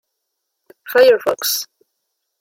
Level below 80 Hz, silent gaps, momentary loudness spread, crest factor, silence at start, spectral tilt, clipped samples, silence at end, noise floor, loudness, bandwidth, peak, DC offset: -66 dBFS; none; 10 LU; 16 dB; 0.85 s; -0.5 dB/octave; under 0.1%; 0.75 s; -76 dBFS; -15 LUFS; 16.5 kHz; -2 dBFS; under 0.1%